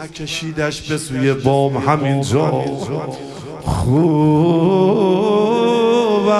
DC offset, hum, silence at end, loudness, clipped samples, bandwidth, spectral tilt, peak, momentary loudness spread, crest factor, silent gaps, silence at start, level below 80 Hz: under 0.1%; none; 0 s; -16 LUFS; under 0.1%; 13 kHz; -6.5 dB/octave; 0 dBFS; 10 LU; 16 dB; none; 0 s; -40 dBFS